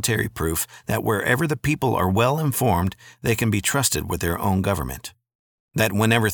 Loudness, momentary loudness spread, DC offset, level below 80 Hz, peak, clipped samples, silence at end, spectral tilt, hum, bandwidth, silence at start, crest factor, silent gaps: -22 LUFS; 8 LU; under 0.1%; -42 dBFS; -4 dBFS; under 0.1%; 0 s; -4.5 dB/octave; none; 19.5 kHz; 0 s; 18 dB; 5.35-5.68 s